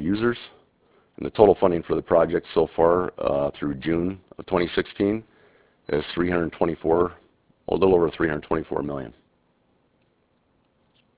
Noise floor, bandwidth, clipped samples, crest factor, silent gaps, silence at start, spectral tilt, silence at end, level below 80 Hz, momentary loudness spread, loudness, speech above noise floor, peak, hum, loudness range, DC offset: -66 dBFS; 4 kHz; under 0.1%; 24 dB; none; 0 s; -10.5 dB/octave; 2.1 s; -48 dBFS; 13 LU; -23 LUFS; 44 dB; 0 dBFS; none; 5 LU; under 0.1%